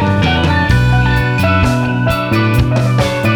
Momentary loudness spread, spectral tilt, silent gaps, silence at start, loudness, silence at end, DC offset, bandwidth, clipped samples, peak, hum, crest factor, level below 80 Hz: 2 LU; -6.5 dB/octave; none; 0 s; -13 LUFS; 0 s; under 0.1%; 18 kHz; under 0.1%; 0 dBFS; none; 12 dB; -24 dBFS